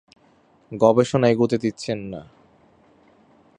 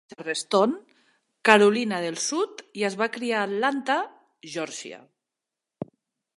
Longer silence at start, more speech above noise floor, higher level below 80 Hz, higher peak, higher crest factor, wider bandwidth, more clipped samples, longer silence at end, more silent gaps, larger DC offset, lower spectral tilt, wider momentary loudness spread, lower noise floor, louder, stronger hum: first, 0.7 s vs 0.1 s; second, 38 dB vs 63 dB; first, -60 dBFS vs -78 dBFS; about the same, -2 dBFS vs 0 dBFS; second, 20 dB vs 26 dB; about the same, 10.5 kHz vs 11.5 kHz; neither; first, 1.35 s vs 0.5 s; neither; neither; first, -6.5 dB/octave vs -3.5 dB/octave; about the same, 19 LU vs 20 LU; second, -58 dBFS vs -87 dBFS; first, -20 LUFS vs -24 LUFS; neither